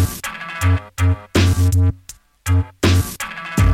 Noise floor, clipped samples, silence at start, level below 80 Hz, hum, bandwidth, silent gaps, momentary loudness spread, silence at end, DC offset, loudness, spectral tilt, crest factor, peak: -42 dBFS; under 0.1%; 0 s; -28 dBFS; none; 15.5 kHz; none; 11 LU; 0 s; under 0.1%; -19 LUFS; -5.5 dB/octave; 14 dB; -2 dBFS